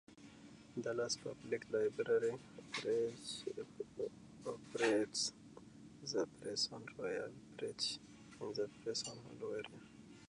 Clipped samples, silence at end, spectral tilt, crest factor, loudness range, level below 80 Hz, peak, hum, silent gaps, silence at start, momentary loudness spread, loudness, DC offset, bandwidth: under 0.1%; 0.05 s; -3 dB/octave; 22 dB; 3 LU; -76 dBFS; -20 dBFS; none; none; 0.1 s; 22 LU; -42 LUFS; under 0.1%; 11 kHz